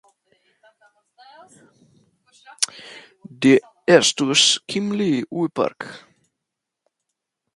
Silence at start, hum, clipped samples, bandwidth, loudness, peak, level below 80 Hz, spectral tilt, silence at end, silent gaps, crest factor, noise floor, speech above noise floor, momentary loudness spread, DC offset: 2.6 s; none; under 0.1%; 11.5 kHz; -18 LUFS; 0 dBFS; -68 dBFS; -3 dB/octave; 1.6 s; none; 22 dB; -82 dBFS; 63 dB; 18 LU; under 0.1%